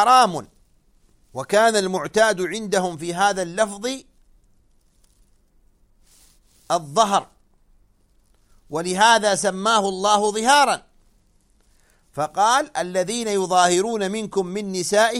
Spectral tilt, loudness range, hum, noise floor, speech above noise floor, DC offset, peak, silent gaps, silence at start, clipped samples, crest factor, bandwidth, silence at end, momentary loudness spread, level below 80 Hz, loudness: -3 dB/octave; 8 LU; none; -59 dBFS; 40 dB; under 0.1%; 0 dBFS; none; 0 s; under 0.1%; 20 dB; 15 kHz; 0 s; 12 LU; -58 dBFS; -20 LUFS